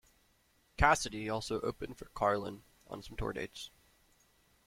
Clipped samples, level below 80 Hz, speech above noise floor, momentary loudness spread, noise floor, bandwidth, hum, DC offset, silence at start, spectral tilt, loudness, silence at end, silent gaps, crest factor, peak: under 0.1%; -48 dBFS; 36 dB; 21 LU; -71 dBFS; 16.5 kHz; none; under 0.1%; 0.8 s; -4 dB/octave; -35 LUFS; 1 s; none; 26 dB; -12 dBFS